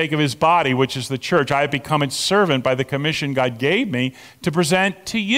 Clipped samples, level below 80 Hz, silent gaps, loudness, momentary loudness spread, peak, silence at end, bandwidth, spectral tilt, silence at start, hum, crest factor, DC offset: under 0.1%; -54 dBFS; none; -19 LUFS; 7 LU; -6 dBFS; 0 s; 16.5 kHz; -4.5 dB/octave; 0 s; none; 14 dB; under 0.1%